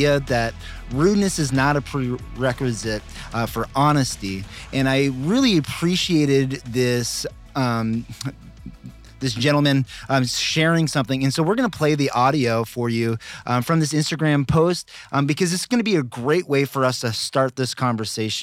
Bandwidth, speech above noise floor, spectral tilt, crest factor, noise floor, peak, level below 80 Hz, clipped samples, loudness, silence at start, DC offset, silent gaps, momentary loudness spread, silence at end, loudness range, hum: 16 kHz; 20 dB; -5 dB/octave; 14 dB; -41 dBFS; -6 dBFS; -44 dBFS; under 0.1%; -21 LUFS; 0 s; under 0.1%; none; 10 LU; 0 s; 3 LU; none